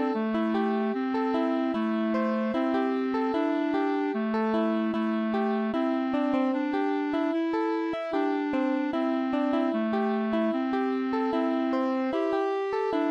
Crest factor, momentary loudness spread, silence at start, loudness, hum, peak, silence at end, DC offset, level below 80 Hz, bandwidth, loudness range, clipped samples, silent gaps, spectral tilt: 12 dB; 1 LU; 0 s; -27 LUFS; none; -14 dBFS; 0 s; under 0.1%; -66 dBFS; 7 kHz; 0 LU; under 0.1%; none; -7.5 dB/octave